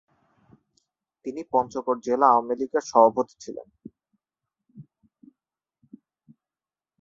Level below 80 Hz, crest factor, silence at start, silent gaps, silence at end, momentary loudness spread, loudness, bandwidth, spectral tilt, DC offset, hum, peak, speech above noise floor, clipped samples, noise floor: -70 dBFS; 24 dB; 1.25 s; none; 2.2 s; 20 LU; -23 LUFS; 7.6 kHz; -5 dB/octave; under 0.1%; none; -4 dBFS; over 67 dB; under 0.1%; under -90 dBFS